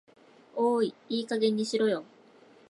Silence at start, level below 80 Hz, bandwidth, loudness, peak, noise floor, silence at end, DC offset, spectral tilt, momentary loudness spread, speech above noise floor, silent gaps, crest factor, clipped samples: 0.55 s; -84 dBFS; 11.5 kHz; -29 LUFS; -14 dBFS; -57 dBFS; 0.65 s; under 0.1%; -5 dB/octave; 8 LU; 29 dB; none; 16 dB; under 0.1%